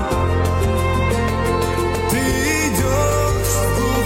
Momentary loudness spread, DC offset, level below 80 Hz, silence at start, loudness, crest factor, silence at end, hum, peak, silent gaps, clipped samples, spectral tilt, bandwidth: 2 LU; under 0.1%; -26 dBFS; 0 s; -18 LUFS; 12 dB; 0 s; none; -4 dBFS; none; under 0.1%; -5 dB/octave; 17 kHz